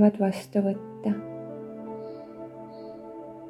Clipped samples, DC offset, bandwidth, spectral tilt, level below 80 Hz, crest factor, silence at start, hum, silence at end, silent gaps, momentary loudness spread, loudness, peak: under 0.1%; under 0.1%; 12.5 kHz; -8 dB/octave; -70 dBFS; 22 dB; 0 s; none; 0 s; none; 15 LU; -30 LUFS; -8 dBFS